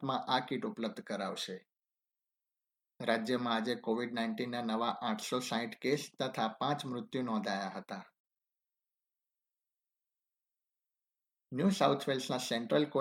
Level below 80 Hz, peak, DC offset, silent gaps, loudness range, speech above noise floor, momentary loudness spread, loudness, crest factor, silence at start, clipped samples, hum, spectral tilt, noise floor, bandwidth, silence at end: -86 dBFS; -14 dBFS; under 0.1%; 8.20-8.24 s; 7 LU; over 55 dB; 9 LU; -35 LUFS; 22 dB; 0 s; under 0.1%; none; -5 dB/octave; under -90 dBFS; 16.5 kHz; 0 s